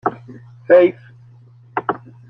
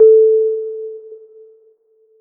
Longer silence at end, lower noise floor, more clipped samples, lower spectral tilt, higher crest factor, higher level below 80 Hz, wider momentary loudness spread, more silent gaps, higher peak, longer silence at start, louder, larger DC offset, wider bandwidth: second, 0.35 s vs 1.05 s; second, -45 dBFS vs -55 dBFS; neither; second, -9 dB/octave vs -11.5 dB/octave; about the same, 18 dB vs 14 dB; first, -64 dBFS vs -78 dBFS; about the same, 24 LU vs 22 LU; neither; about the same, -2 dBFS vs -2 dBFS; about the same, 0.05 s vs 0 s; second, -17 LUFS vs -14 LUFS; neither; first, 4.1 kHz vs 1.4 kHz